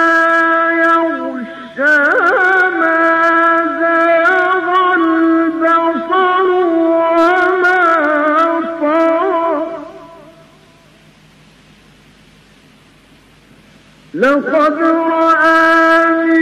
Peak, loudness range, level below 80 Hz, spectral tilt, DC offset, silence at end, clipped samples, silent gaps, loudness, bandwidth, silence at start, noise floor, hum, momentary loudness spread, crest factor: -4 dBFS; 8 LU; -56 dBFS; -4.5 dB/octave; under 0.1%; 0 s; under 0.1%; none; -11 LUFS; 10 kHz; 0 s; -45 dBFS; none; 6 LU; 10 dB